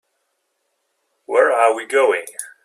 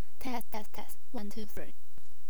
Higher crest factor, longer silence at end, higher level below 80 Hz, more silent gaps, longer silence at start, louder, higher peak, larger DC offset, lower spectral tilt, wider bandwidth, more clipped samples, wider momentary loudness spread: about the same, 18 dB vs 18 dB; first, 0.2 s vs 0 s; second, -80 dBFS vs -58 dBFS; neither; first, 1.3 s vs 0 s; first, -17 LUFS vs -43 LUFS; first, -2 dBFS vs -18 dBFS; second, under 0.1% vs 8%; second, -1 dB/octave vs -5.5 dB/octave; second, 15 kHz vs over 20 kHz; neither; second, 9 LU vs 14 LU